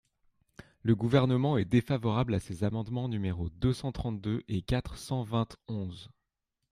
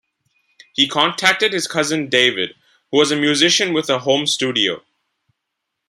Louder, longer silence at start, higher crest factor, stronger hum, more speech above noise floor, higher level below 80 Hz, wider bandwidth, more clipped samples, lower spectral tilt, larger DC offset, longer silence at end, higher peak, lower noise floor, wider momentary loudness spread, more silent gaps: second, -31 LUFS vs -16 LUFS; about the same, 0.85 s vs 0.8 s; about the same, 20 dB vs 20 dB; neither; second, 54 dB vs 61 dB; first, -50 dBFS vs -66 dBFS; second, 13.5 kHz vs 16 kHz; neither; first, -7.5 dB/octave vs -2.5 dB/octave; neither; second, 0.65 s vs 1.1 s; second, -10 dBFS vs 0 dBFS; first, -84 dBFS vs -78 dBFS; first, 10 LU vs 7 LU; neither